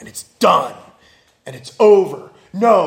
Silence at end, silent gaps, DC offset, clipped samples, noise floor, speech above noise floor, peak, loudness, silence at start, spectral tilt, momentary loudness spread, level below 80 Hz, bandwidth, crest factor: 0 s; none; under 0.1%; under 0.1%; -53 dBFS; 38 dB; 0 dBFS; -14 LUFS; 0 s; -5 dB/octave; 22 LU; -64 dBFS; 16.5 kHz; 16 dB